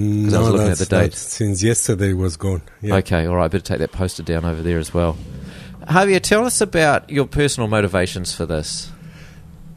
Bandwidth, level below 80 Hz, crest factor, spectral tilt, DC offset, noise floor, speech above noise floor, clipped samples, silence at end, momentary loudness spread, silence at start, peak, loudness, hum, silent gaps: 13.5 kHz; -36 dBFS; 18 dB; -5 dB/octave; under 0.1%; -39 dBFS; 21 dB; under 0.1%; 0 s; 10 LU; 0 s; 0 dBFS; -18 LUFS; none; none